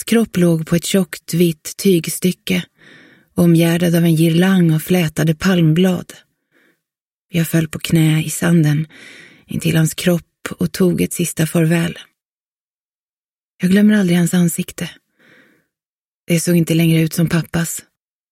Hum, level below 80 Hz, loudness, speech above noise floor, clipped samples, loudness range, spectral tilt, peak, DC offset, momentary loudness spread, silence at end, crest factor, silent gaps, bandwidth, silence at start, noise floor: none; -50 dBFS; -16 LUFS; over 75 dB; under 0.1%; 4 LU; -6 dB/octave; -2 dBFS; under 0.1%; 10 LU; 0.5 s; 16 dB; 7.01-7.29 s, 12.25-13.58 s, 15.86-16.26 s; 16.5 kHz; 0 s; under -90 dBFS